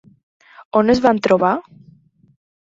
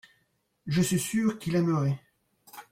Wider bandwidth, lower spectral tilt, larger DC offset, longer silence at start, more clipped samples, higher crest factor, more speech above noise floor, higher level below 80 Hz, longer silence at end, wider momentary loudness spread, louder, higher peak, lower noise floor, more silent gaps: second, 7.8 kHz vs 16.5 kHz; about the same, -6.5 dB/octave vs -5.5 dB/octave; neither; about the same, 0.75 s vs 0.65 s; neither; about the same, 18 dB vs 14 dB; second, 35 dB vs 47 dB; first, -52 dBFS vs -62 dBFS; first, 1.2 s vs 0.1 s; second, 6 LU vs 20 LU; first, -16 LUFS vs -28 LUFS; first, -2 dBFS vs -16 dBFS; second, -51 dBFS vs -73 dBFS; neither